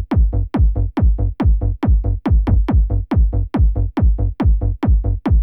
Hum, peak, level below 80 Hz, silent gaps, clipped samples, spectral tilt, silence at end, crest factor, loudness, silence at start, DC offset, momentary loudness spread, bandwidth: none; -6 dBFS; -16 dBFS; none; under 0.1%; -11 dB/octave; 0 s; 10 dB; -18 LUFS; 0 s; under 0.1%; 2 LU; 3.7 kHz